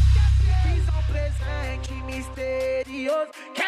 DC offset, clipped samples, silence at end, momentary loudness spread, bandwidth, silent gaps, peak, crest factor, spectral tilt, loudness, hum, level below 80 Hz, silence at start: under 0.1%; under 0.1%; 0 s; 12 LU; 11 kHz; none; -8 dBFS; 14 dB; -6.5 dB/octave; -25 LUFS; none; -24 dBFS; 0 s